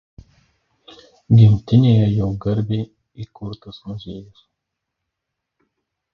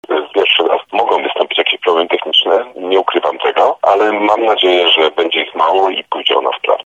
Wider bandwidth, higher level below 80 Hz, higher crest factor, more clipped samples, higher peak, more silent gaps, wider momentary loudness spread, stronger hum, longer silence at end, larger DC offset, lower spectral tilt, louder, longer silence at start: second, 5.4 kHz vs 8 kHz; first, -44 dBFS vs -68 dBFS; first, 18 dB vs 12 dB; neither; about the same, -2 dBFS vs 0 dBFS; neither; first, 23 LU vs 5 LU; neither; first, 1.9 s vs 0.05 s; neither; first, -10 dB/octave vs -3 dB/octave; second, -16 LUFS vs -12 LUFS; first, 1.3 s vs 0.1 s